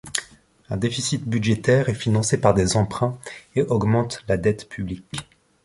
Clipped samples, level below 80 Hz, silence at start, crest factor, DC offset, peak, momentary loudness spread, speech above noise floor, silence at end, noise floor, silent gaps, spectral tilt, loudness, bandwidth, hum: under 0.1%; -44 dBFS; 0.05 s; 22 dB; under 0.1%; 0 dBFS; 13 LU; 28 dB; 0.4 s; -49 dBFS; none; -5.5 dB/octave; -22 LUFS; 11.5 kHz; none